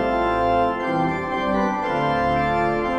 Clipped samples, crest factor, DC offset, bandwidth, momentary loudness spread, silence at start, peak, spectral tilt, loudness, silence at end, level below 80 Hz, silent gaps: under 0.1%; 12 dB; under 0.1%; 10 kHz; 3 LU; 0 s; -8 dBFS; -7 dB/octave; -21 LUFS; 0 s; -40 dBFS; none